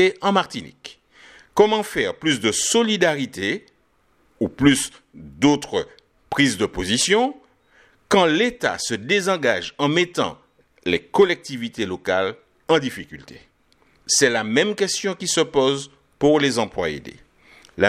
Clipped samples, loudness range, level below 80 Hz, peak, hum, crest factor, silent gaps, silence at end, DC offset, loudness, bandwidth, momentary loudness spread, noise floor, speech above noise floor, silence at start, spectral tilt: under 0.1%; 3 LU; -52 dBFS; -2 dBFS; none; 20 dB; none; 0 s; under 0.1%; -20 LUFS; 15 kHz; 13 LU; -62 dBFS; 42 dB; 0 s; -3.5 dB/octave